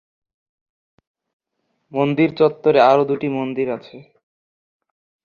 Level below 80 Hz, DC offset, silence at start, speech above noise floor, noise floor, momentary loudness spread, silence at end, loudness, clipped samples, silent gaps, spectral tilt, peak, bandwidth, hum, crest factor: -64 dBFS; under 0.1%; 1.95 s; 55 dB; -72 dBFS; 12 LU; 1.2 s; -18 LUFS; under 0.1%; none; -8 dB/octave; -2 dBFS; 6.8 kHz; none; 18 dB